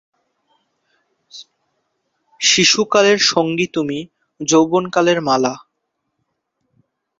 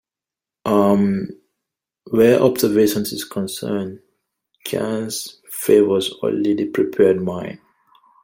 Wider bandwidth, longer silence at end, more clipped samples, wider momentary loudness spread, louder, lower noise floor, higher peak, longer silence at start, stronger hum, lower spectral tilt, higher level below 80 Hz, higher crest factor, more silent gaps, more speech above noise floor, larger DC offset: second, 7.8 kHz vs 16.5 kHz; first, 1.6 s vs 0.65 s; neither; about the same, 12 LU vs 14 LU; first, -15 LUFS vs -18 LUFS; second, -74 dBFS vs -89 dBFS; about the same, 0 dBFS vs -2 dBFS; first, 1.35 s vs 0.65 s; neither; second, -2.5 dB/octave vs -5.5 dB/octave; about the same, -62 dBFS vs -58 dBFS; about the same, 20 dB vs 18 dB; neither; second, 59 dB vs 71 dB; neither